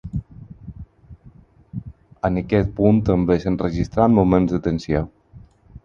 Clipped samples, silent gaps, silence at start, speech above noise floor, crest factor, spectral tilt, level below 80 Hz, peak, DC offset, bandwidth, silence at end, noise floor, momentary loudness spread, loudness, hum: under 0.1%; none; 0.05 s; 30 dB; 20 dB; -9 dB/octave; -38 dBFS; -2 dBFS; under 0.1%; 7.2 kHz; 0.05 s; -48 dBFS; 20 LU; -19 LUFS; none